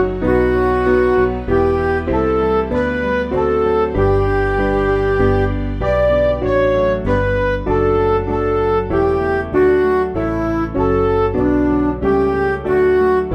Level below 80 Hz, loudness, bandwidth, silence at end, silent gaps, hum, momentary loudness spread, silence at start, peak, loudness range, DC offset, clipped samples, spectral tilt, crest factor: -28 dBFS; -16 LUFS; 6.2 kHz; 0 s; none; none; 4 LU; 0 s; -2 dBFS; 1 LU; under 0.1%; under 0.1%; -8.5 dB/octave; 12 dB